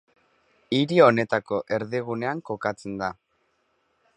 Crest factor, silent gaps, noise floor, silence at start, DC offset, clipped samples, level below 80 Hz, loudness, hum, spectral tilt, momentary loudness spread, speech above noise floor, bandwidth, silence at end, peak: 24 dB; none; -70 dBFS; 0.7 s; under 0.1%; under 0.1%; -64 dBFS; -24 LUFS; none; -6.5 dB/octave; 13 LU; 47 dB; 10 kHz; 1.05 s; -2 dBFS